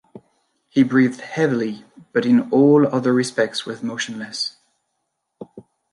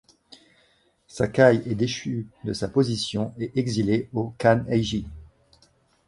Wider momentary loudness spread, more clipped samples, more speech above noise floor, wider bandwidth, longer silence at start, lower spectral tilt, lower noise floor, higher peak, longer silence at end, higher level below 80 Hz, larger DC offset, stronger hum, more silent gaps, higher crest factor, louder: about the same, 13 LU vs 13 LU; neither; first, 57 dB vs 40 dB; about the same, 11.5 kHz vs 11.5 kHz; second, 0.15 s vs 1.15 s; about the same, -5.5 dB/octave vs -6 dB/octave; first, -75 dBFS vs -63 dBFS; about the same, -4 dBFS vs -4 dBFS; second, 0.35 s vs 0.8 s; second, -70 dBFS vs -50 dBFS; neither; neither; neither; second, 16 dB vs 22 dB; first, -19 LUFS vs -24 LUFS